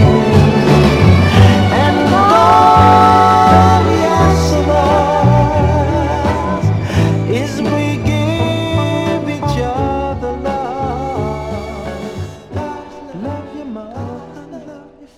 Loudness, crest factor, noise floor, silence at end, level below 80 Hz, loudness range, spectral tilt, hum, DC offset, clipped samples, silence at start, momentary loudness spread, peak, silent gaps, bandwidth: -12 LUFS; 12 dB; -36 dBFS; 0.15 s; -28 dBFS; 15 LU; -7 dB/octave; none; under 0.1%; under 0.1%; 0 s; 19 LU; 0 dBFS; none; 13.5 kHz